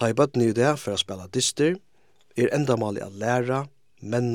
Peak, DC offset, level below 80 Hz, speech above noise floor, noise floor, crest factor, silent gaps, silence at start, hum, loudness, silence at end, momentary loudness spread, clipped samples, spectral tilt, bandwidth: -6 dBFS; 0.1%; -68 dBFS; 41 dB; -64 dBFS; 18 dB; none; 0 s; none; -24 LUFS; 0 s; 10 LU; under 0.1%; -5 dB/octave; 17 kHz